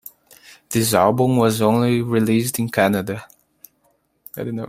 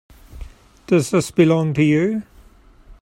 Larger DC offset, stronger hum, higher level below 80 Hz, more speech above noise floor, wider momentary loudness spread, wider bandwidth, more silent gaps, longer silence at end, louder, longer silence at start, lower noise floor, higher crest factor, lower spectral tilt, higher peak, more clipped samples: neither; neither; second, -56 dBFS vs -44 dBFS; first, 46 dB vs 31 dB; first, 13 LU vs 5 LU; about the same, 16 kHz vs 15.5 kHz; neither; about the same, 0 s vs 0.1 s; about the same, -18 LUFS vs -18 LUFS; first, 0.7 s vs 0.3 s; first, -64 dBFS vs -48 dBFS; about the same, 18 dB vs 18 dB; about the same, -5.5 dB/octave vs -6.5 dB/octave; about the same, -2 dBFS vs -2 dBFS; neither